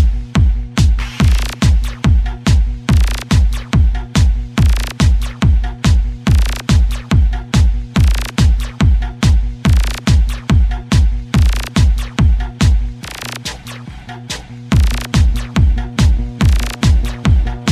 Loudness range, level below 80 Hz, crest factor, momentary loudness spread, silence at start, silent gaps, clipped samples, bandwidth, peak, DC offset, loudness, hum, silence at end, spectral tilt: 3 LU; -14 dBFS; 12 dB; 2 LU; 0 s; none; under 0.1%; 13.5 kHz; 0 dBFS; under 0.1%; -15 LUFS; none; 0 s; -5.5 dB/octave